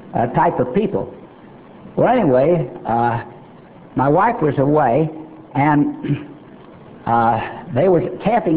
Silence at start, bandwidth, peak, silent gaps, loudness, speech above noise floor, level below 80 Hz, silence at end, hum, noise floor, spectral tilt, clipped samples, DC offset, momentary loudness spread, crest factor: 0 s; 4 kHz; -2 dBFS; none; -18 LUFS; 25 dB; -48 dBFS; 0 s; none; -41 dBFS; -12 dB/octave; under 0.1%; 0.2%; 12 LU; 16 dB